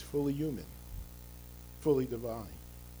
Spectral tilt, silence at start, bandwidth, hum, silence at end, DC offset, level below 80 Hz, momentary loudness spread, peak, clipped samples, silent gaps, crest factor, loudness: -7.5 dB/octave; 0 s; over 20 kHz; 60 Hz at -50 dBFS; 0 s; under 0.1%; -50 dBFS; 19 LU; -16 dBFS; under 0.1%; none; 20 dB; -35 LUFS